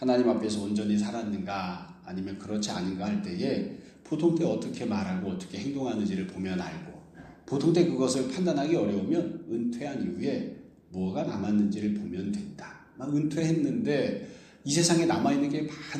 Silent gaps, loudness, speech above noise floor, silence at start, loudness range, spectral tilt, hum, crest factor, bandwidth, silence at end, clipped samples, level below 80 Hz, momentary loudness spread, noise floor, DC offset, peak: none; -29 LUFS; 21 dB; 0 s; 4 LU; -5.5 dB/octave; none; 20 dB; 12.5 kHz; 0 s; under 0.1%; -64 dBFS; 15 LU; -50 dBFS; under 0.1%; -10 dBFS